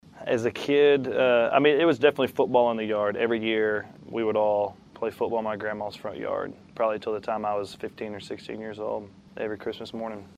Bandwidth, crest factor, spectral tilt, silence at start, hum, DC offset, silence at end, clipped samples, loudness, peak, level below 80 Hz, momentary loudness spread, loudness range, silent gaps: 13.5 kHz; 20 dB; -6 dB/octave; 0.15 s; none; under 0.1%; 0.1 s; under 0.1%; -26 LUFS; -6 dBFS; -66 dBFS; 15 LU; 9 LU; none